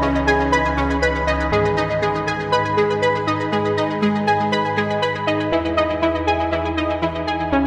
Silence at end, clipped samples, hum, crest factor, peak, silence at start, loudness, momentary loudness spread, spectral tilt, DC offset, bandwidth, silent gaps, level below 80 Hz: 0 s; under 0.1%; none; 16 dB; -4 dBFS; 0 s; -19 LUFS; 3 LU; -6 dB/octave; under 0.1%; 10.5 kHz; none; -34 dBFS